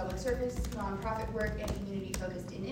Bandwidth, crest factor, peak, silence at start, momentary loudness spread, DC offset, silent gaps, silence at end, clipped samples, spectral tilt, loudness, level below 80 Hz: 16.5 kHz; 20 dB; -16 dBFS; 0 s; 4 LU; under 0.1%; none; 0 s; under 0.1%; -5.5 dB/octave; -37 LUFS; -42 dBFS